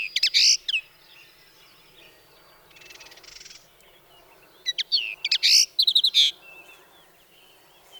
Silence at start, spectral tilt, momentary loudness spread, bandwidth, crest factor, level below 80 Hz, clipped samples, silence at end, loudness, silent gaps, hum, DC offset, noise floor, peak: 0 s; 4.5 dB/octave; 15 LU; over 20 kHz; 20 dB; -70 dBFS; under 0.1%; 0 s; -19 LUFS; none; none; under 0.1%; -55 dBFS; -8 dBFS